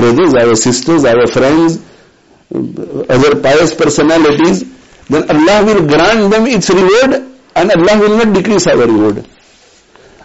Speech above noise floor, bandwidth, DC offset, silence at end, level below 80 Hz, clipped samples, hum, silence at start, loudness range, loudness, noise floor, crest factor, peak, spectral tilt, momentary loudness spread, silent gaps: 36 dB; 8.2 kHz; under 0.1%; 1 s; -38 dBFS; under 0.1%; none; 0 s; 2 LU; -9 LUFS; -45 dBFS; 8 dB; 0 dBFS; -5 dB/octave; 11 LU; none